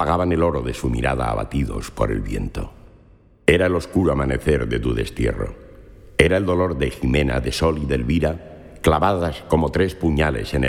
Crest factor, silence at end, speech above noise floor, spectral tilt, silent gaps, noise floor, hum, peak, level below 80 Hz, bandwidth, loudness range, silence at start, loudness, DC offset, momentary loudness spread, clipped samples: 20 dB; 0 s; 31 dB; -6.5 dB/octave; none; -51 dBFS; none; 0 dBFS; -30 dBFS; 15.5 kHz; 2 LU; 0 s; -21 LUFS; under 0.1%; 9 LU; under 0.1%